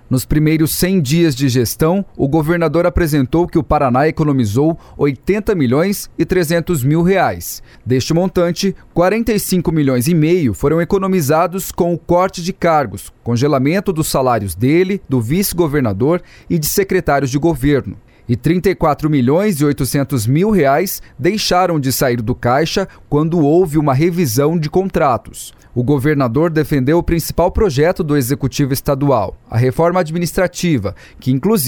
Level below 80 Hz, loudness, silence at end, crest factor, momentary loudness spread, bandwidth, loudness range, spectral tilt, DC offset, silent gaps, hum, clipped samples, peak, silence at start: -32 dBFS; -15 LUFS; 0 s; 12 dB; 5 LU; 19.5 kHz; 1 LU; -6 dB/octave; under 0.1%; none; none; under 0.1%; -2 dBFS; 0.1 s